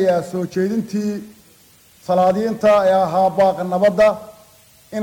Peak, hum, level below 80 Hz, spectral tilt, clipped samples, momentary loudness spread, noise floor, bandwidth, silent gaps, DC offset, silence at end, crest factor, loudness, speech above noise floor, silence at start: -4 dBFS; none; -54 dBFS; -6.5 dB/octave; under 0.1%; 13 LU; -50 dBFS; 18 kHz; none; under 0.1%; 0 s; 14 dB; -17 LUFS; 34 dB; 0 s